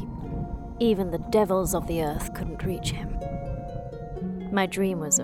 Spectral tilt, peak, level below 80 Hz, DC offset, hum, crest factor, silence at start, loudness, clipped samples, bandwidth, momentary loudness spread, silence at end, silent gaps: -4.5 dB/octave; -10 dBFS; -38 dBFS; under 0.1%; none; 18 dB; 0 s; -28 LUFS; under 0.1%; 16.5 kHz; 11 LU; 0 s; none